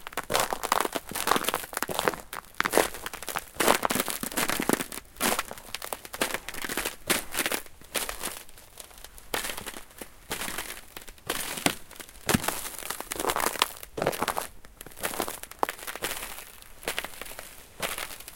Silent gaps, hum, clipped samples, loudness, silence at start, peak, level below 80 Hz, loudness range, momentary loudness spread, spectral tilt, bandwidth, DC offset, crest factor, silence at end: none; none; under 0.1%; -30 LUFS; 0 s; 0 dBFS; -52 dBFS; 7 LU; 15 LU; -2 dB/octave; 17 kHz; under 0.1%; 32 dB; 0 s